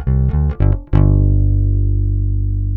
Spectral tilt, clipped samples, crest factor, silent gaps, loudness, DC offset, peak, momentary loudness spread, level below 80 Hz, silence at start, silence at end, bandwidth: -12.5 dB/octave; under 0.1%; 14 dB; none; -16 LUFS; under 0.1%; 0 dBFS; 5 LU; -16 dBFS; 0 s; 0 s; 3.1 kHz